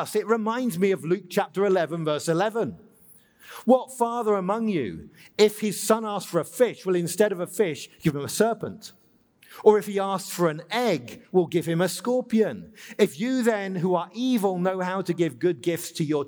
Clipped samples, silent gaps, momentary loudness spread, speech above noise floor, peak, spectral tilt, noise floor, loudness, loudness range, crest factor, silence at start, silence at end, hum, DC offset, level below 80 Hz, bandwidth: under 0.1%; none; 7 LU; 34 dB; -4 dBFS; -5.5 dB/octave; -58 dBFS; -25 LUFS; 1 LU; 20 dB; 0 s; 0 s; none; under 0.1%; -66 dBFS; over 20 kHz